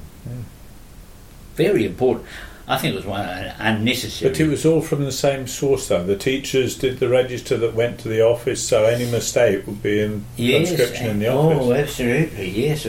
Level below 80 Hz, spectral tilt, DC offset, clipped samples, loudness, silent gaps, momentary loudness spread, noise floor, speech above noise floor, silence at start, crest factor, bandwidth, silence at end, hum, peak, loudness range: -42 dBFS; -5 dB/octave; under 0.1%; under 0.1%; -20 LUFS; none; 9 LU; -41 dBFS; 22 dB; 0 s; 16 dB; 16.5 kHz; 0 s; none; -4 dBFS; 3 LU